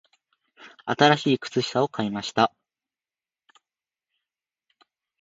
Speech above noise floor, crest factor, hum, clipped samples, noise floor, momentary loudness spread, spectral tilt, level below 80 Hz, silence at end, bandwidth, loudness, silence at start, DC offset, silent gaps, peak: over 67 dB; 26 dB; none; under 0.1%; under -90 dBFS; 10 LU; -5 dB/octave; -68 dBFS; 2.75 s; 8 kHz; -23 LUFS; 0.6 s; under 0.1%; none; -2 dBFS